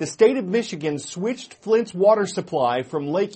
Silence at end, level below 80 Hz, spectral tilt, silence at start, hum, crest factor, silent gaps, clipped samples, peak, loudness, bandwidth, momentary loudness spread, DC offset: 0 s; -68 dBFS; -5 dB/octave; 0 s; none; 18 dB; none; under 0.1%; -4 dBFS; -22 LUFS; 8.8 kHz; 9 LU; under 0.1%